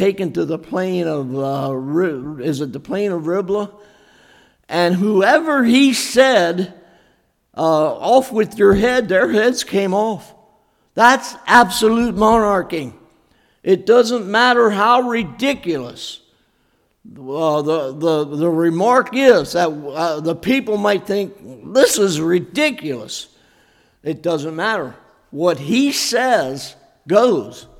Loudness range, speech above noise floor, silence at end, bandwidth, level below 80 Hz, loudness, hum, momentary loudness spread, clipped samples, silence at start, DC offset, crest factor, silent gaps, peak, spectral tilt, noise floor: 6 LU; 46 dB; 0.2 s; 17 kHz; -48 dBFS; -16 LUFS; none; 14 LU; under 0.1%; 0 s; under 0.1%; 18 dB; none; 0 dBFS; -4.5 dB/octave; -62 dBFS